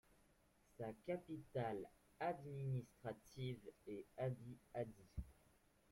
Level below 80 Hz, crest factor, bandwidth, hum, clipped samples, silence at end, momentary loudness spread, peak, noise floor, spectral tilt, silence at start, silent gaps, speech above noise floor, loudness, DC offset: -68 dBFS; 18 dB; 15.5 kHz; none; under 0.1%; 0.6 s; 9 LU; -32 dBFS; -76 dBFS; -7.5 dB/octave; 0.8 s; none; 27 dB; -50 LUFS; under 0.1%